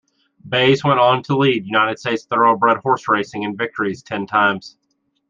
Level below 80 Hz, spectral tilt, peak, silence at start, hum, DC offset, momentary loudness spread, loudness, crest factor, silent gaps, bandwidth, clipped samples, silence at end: -62 dBFS; -6 dB/octave; -2 dBFS; 0.45 s; none; under 0.1%; 9 LU; -17 LUFS; 16 dB; none; 7.6 kHz; under 0.1%; 0.6 s